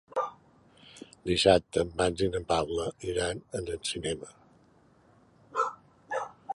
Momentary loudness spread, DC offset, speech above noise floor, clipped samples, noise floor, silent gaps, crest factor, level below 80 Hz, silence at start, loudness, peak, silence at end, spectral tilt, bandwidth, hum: 15 LU; under 0.1%; 33 dB; under 0.1%; -62 dBFS; none; 24 dB; -52 dBFS; 0.1 s; -30 LUFS; -6 dBFS; 0 s; -4 dB/octave; 11.5 kHz; none